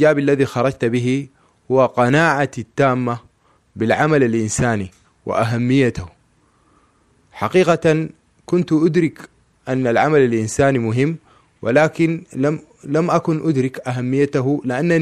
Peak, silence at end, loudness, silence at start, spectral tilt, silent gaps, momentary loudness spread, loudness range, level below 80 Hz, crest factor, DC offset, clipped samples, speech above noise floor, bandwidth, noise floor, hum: -2 dBFS; 0 s; -18 LUFS; 0 s; -6.5 dB/octave; none; 10 LU; 2 LU; -50 dBFS; 16 dB; under 0.1%; under 0.1%; 41 dB; 13 kHz; -58 dBFS; none